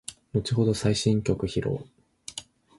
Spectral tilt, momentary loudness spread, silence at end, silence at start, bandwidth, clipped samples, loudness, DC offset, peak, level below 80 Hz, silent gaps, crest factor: -6 dB/octave; 15 LU; 0.35 s; 0.1 s; 11.5 kHz; under 0.1%; -26 LUFS; under 0.1%; -8 dBFS; -48 dBFS; none; 18 dB